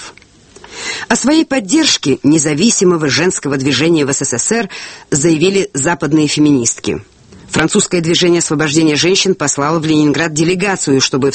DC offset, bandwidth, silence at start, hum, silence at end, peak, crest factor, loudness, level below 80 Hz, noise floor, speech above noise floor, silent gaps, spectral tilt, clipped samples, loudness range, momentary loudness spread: under 0.1%; 8.8 kHz; 0 s; none; 0 s; 0 dBFS; 12 dB; -12 LUFS; -46 dBFS; -42 dBFS; 29 dB; none; -3.5 dB/octave; under 0.1%; 2 LU; 7 LU